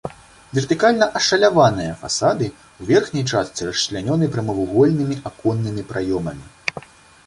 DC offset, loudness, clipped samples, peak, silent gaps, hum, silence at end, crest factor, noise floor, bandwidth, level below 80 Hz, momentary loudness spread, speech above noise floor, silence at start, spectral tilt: under 0.1%; -19 LUFS; under 0.1%; -2 dBFS; none; none; 0.45 s; 18 dB; -39 dBFS; 11.5 kHz; -48 dBFS; 12 LU; 20 dB; 0.05 s; -5 dB/octave